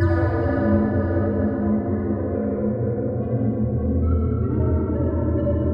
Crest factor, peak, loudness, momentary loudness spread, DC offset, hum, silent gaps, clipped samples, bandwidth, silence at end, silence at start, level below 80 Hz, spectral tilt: 14 dB; -6 dBFS; -22 LUFS; 4 LU; under 0.1%; none; none; under 0.1%; 4.9 kHz; 0 s; 0 s; -32 dBFS; -12.5 dB/octave